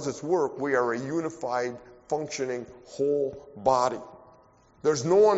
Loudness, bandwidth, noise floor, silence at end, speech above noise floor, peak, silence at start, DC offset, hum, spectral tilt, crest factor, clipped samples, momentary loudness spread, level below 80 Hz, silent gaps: -28 LUFS; 8 kHz; -58 dBFS; 0 s; 32 dB; -8 dBFS; 0 s; under 0.1%; none; -5 dB/octave; 18 dB; under 0.1%; 12 LU; -64 dBFS; none